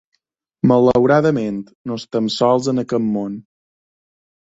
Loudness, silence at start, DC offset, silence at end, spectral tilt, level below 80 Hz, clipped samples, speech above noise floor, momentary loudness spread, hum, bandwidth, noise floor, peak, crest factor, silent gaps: -17 LUFS; 0.65 s; under 0.1%; 1.1 s; -7 dB/octave; -54 dBFS; under 0.1%; 53 dB; 15 LU; none; 8 kHz; -69 dBFS; -2 dBFS; 16 dB; 1.75-1.85 s